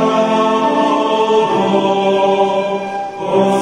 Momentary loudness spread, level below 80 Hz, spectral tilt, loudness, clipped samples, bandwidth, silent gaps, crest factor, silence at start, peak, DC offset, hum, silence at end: 6 LU; -56 dBFS; -5.5 dB/octave; -14 LUFS; under 0.1%; 11.5 kHz; none; 12 dB; 0 s; -2 dBFS; under 0.1%; none; 0 s